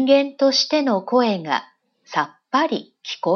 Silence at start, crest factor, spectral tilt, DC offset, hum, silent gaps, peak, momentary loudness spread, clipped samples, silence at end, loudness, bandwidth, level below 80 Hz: 0 s; 16 dB; -4 dB/octave; under 0.1%; none; none; -4 dBFS; 9 LU; under 0.1%; 0 s; -20 LUFS; 6.8 kHz; -78 dBFS